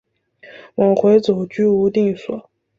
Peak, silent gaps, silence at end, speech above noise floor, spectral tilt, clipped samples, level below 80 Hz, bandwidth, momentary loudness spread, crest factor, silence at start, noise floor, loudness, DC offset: -2 dBFS; none; 0.4 s; 31 dB; -8 dB/octave; under 0.1%; -58 dBFS; 7.4 kHz; 16 LU; 16 dB; 0.45 s; -46 dBFS; -16 LUFS; under 0.1%